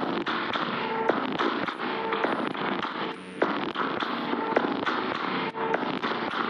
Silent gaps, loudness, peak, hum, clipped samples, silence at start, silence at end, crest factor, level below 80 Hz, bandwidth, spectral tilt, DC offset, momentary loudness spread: none; -28 LUFS; -8 dBFS; none; under 0.1%; 0 s; 0 s; 20 dB; -70 dBFS; 10.5 kHz; -5.5 dB/octave; under 0.1%; 3 LU